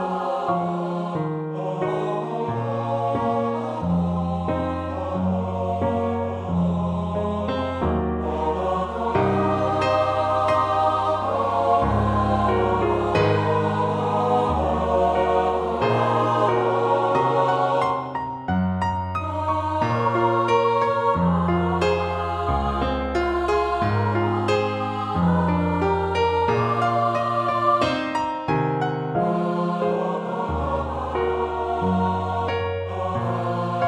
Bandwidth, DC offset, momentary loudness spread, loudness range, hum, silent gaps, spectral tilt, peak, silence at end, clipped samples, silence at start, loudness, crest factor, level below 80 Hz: 10 kHz; under 0.1%; 6 LU; 4 LU; none; none; -7.5 dB/octave; -6 dBFS; 0 s; under 0.1%; 0 s; -22 LUFS; 16 dB; -40 dBFS